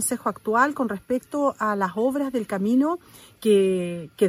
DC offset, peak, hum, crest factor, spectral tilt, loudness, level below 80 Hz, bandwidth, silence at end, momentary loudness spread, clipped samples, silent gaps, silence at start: under 0.1%; -6 dBFS; none; 18 dB; -5 dB/octave; -24 LUFS; -62 dBFS; 16 kHz; 0 s; 8 LU; under 0.1%; none; 0 s